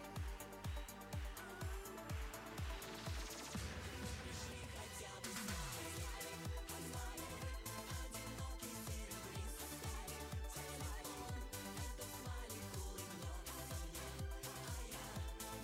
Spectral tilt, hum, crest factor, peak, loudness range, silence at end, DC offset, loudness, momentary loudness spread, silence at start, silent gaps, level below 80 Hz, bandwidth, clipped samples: -3.5 dB/octave; none; 14 dB; -32 dBFS; 1 LU; 0 s; under 0.1%; -48 LUFS; 2 LU; 0 s; none; -52 dBFS; 16.5 kHz; under 0.1%